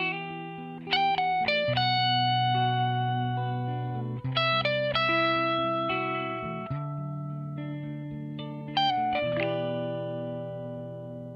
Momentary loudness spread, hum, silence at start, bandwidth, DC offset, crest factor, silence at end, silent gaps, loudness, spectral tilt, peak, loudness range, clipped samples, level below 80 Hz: 13 LU; none; 0 s; 7 kHz; under 0.1%; 16 dB; 0 s; none; -28 LUFS; -7 dB/octave; -14 dBFS; 5 LU; under 0.1%; -62 dBFS